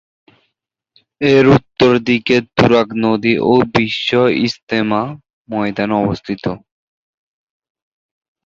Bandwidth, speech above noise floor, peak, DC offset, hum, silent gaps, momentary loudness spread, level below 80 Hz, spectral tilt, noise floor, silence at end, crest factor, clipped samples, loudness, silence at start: 7.6 kHz; 61 dB; -2 dBFS; under 0.1%; none; 4.63-4.67 s, 5.33-5.45 s; 10 LU; -46 dBFS; -6.5 dB/octave; -75 dBFS; 1.9 s; 14 dB; under 0.1%; -14 LUFS; 1.2 s